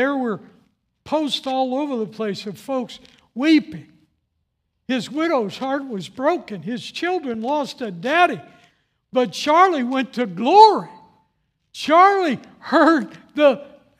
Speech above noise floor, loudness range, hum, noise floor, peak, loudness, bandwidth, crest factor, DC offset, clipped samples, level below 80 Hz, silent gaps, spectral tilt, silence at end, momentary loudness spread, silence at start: 54 dB; 8 LU; none; -73 dBFS; 0 dBFS; -19 LUFS; 14 kHz; 20 dB; under 0.1%; under 0.1%; -70 dBFS; none; -5 dB/octave; 0.3 s; 16 LU; 0 s